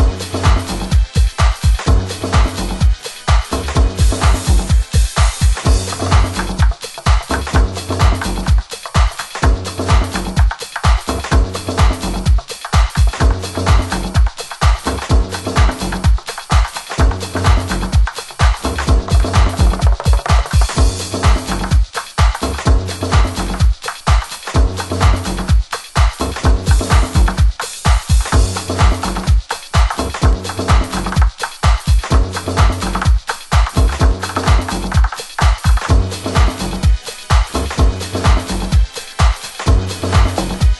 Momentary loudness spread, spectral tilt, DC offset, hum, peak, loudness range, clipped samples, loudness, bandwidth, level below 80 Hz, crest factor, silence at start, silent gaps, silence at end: 4 LU; -5 dB/octave; under 0.1%; none; 0 dBFS; 2 LU; under 0.1%; -16 LUFS; 12.5 kHz; -16 dBFS; 14 dB; 0 s; none; 0 s